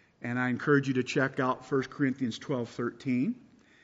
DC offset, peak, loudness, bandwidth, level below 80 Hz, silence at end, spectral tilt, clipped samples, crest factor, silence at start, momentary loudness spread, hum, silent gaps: under 0.1%; -12 dBFS; -30 LUFS; 7.8 kHz; -72 dBFS; 0.45 s; -5.5 dB/octave; under 0.1%; 20 dB; 0.2 s; 8 LU; none; none